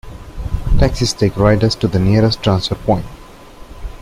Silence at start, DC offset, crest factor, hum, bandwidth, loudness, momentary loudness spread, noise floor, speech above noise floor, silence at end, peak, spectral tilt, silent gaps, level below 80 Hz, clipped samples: 0.05 s; under 0.1%; 14 dB; none; 14 kHz; -15 LUFS; 20 LU; -36 dBFS; 22 dB; 0.05 s; -2 dBFS; -6 dB/octave; none; -24 dBFS; under 0.1%